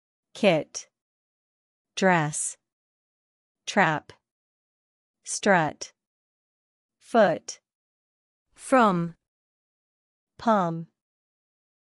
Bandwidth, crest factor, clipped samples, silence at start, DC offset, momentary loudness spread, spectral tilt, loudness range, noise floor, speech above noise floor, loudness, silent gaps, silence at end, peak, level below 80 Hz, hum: 12 kHz; 22 dB; under 0.1%; 0.35 s; under 0.1%; 18 LU; -4.5 dB/octave; 3 LU; under -90 dBFS; over 67 dB; -24 LUFS; 1.02-1.85 s, 2.73-3.55 s, 4.31-5.14 s, 6.07-6.89 s, 7.75-8.46 s, 9.28-10.27 s; 1 s; -6 dBFS; -72 dBFS; none